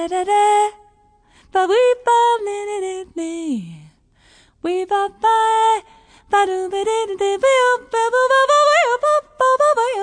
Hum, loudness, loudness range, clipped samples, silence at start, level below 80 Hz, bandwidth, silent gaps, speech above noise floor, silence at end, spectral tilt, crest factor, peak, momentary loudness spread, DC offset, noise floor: none; -17 LUFS; 6 LU; under 0.1%; 0 s; -58 dBFS; 10 kHz; none; 37 dB; 0 s; -2.5 dB/octave; 12 dB; -4 dBFS; 11 LU; under 0.1%; -54 dBFS